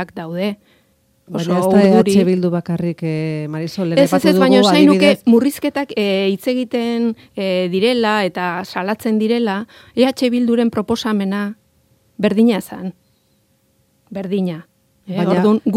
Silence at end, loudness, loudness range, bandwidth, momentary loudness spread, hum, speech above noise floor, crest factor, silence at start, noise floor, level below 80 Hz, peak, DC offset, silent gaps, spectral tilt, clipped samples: 0 s; -16 LUFS; 8 LU; 16 kHz; 13 LU; none; 44 dB; 16 dB; 0 s; -60 dBFS; -60 dBFS; 0 dBFS; under 0.1%; none; -6 dB/octave; under 0.1%